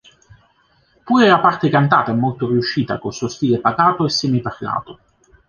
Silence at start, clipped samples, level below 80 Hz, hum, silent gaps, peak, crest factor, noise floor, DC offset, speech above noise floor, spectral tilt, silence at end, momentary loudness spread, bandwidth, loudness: 1.05 s; under 0.1%; -54 dBFS; none; none; -2 dBFS; 16 dB; -58 dBFS; under 0.1%; 42 dB; -6 dB/octave; 0.55 s; 11 LU; 7.2 kHz; -17 LUFS